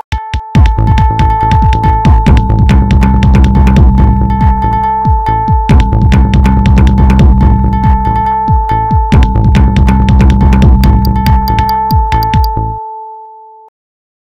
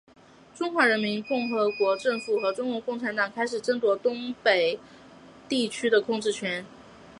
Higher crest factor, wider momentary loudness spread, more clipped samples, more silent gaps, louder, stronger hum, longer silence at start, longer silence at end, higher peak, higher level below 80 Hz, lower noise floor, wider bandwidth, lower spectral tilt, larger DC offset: second, 6 dB vs 20 dB; second, 4 LU vs 8 LU; first, 4% vs under 0.1%; neither; first, -8 LUFS vs -26 LUFS; neither; second, 0.1 s vs 0.55 s; first, 0.95 s vs 0.05 s; first, 0 dBFS vs -8 dBFS; first, -10 dBFS vs -70 dBFS; second, -32 dBFS vs -50 dBFS; first, 14.5 kHz vs 11.5 kHz; first, -8 dB/octave vs -4 dB/octave; neither